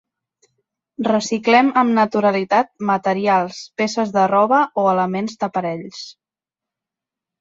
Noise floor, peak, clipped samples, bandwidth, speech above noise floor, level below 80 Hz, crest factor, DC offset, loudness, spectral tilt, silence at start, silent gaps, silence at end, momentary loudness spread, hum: -88 dBFS; -2 dBFS; under 0.1%; 7.8 kHz; 70 dB; -66 dBFS; 16 dB; under 0.1%; -18 LUFS; -5 dB/octave; 1 s; none; 1.3 s; 12 LU; none